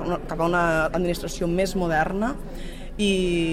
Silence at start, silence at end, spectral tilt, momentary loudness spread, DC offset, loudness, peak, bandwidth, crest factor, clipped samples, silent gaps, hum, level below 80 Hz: 0 s; 0 s; -5.5 dB/octave; 13 LU; under 0.1%; -24 LUFS; -10 dBFS; 16 kHz; 14 dB; under 0.1%; none; none; -34 dBFS